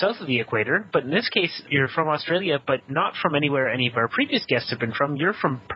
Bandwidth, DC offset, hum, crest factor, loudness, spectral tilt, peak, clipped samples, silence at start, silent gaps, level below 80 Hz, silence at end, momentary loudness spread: 5.8 kHz; under 0.1%; none; 20 dB; -23 LUFS; -8 dB/octave; -2 dBFS; under 0.1%; 0 s; none; -62 dBFS; 0 s; 3 LU